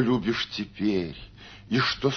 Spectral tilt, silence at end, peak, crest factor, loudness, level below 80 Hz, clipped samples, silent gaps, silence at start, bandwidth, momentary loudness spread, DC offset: -5.5 dB/octave; 0 s; -10 dBFS; 18 dB; -27 LUFS; -52 dBFS; under 0.1%; none; 0 s; 6.6 kHz; 20 LU; under 0.1%